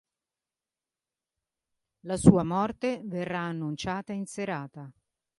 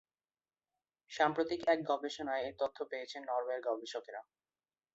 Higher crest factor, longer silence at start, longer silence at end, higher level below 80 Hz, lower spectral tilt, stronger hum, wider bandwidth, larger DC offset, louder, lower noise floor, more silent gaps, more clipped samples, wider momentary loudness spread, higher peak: first, 28 dB vs 22 dB; first, 2.05 s vs 1.1 s; second, 0.5 s vs 0.7 s; first, -54 dBFS vs -78 dBFS; first, -6.5 dB/octave vs -2 dB/octave; neither; first, 11.5 kHz vs 8 kHz; neither; first, -28 LUFS vs -37 LUFS; about the same, under -90 dBFS vs under -90 dBFS; neither; neither; first, 15 LU vs 12 LU; first, -4 dBFS vs -16 dBFS